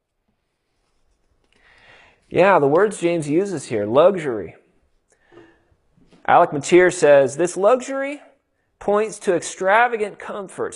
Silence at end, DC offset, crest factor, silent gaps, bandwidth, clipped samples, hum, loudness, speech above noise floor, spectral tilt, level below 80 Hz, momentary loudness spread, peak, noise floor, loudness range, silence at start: 0 s; under 0.1%; 20 dB; none; 11.5 kHz; under 0.1%; none; -18 LUFS; 54 dB; -5 dB/octave; -60 dBFS; 15 LU; 0 dBFS; -71 dBFS; 4 LU; 2.3 s